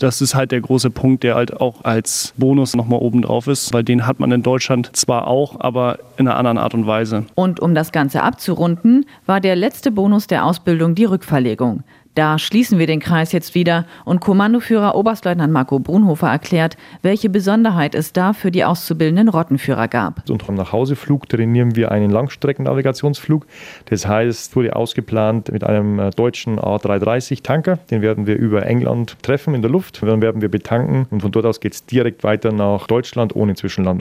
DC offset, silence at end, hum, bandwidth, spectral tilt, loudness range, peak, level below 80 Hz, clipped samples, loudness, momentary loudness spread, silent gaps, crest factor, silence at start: under 0.1%; 0 s; none; 16 kHz; -6 dB/octave; 2 LU; 0 dBFS; -50 dBFS; under 0.1%; -16 LUFS; 5 LU; none; 16 dB; 0 s